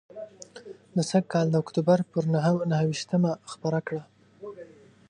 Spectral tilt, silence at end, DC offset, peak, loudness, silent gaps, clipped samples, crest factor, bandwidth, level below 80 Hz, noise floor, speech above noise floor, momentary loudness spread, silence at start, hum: -7 dB/octave; 0.45 s; under 0.1%; -8 dBFS; -26 LUFS; none; under 0.1%; 18 dB; 10.5 kHz; -70 dBFS; -49 dBFS; 24 dB; 20 LU; 0.15 s; none